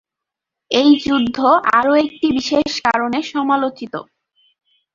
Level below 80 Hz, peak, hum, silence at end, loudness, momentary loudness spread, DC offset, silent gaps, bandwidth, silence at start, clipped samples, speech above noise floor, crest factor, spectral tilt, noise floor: -54 dBFS; -2 dBFS; none; 0.95 s; -16 LUFS; 9 LU; under 0.1%; none; 7.4 kHz; 0.7 s; under 0.1%; 68 dB; 16 dB; -4 dB/octave; -84 dBFS